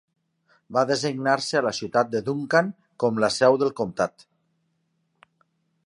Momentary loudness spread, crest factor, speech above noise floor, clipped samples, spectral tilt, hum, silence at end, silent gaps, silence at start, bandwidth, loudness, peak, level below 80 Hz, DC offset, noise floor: 8 LU; 22 dB; 49 dB; under 0.1%; -4.5 dB/octave; none; 1.75 s; none; 0.7 s; 11.5 kHz; -23 LUFS; -4 dBFS; -66 dBFS; under 0.1%; -72 dBFS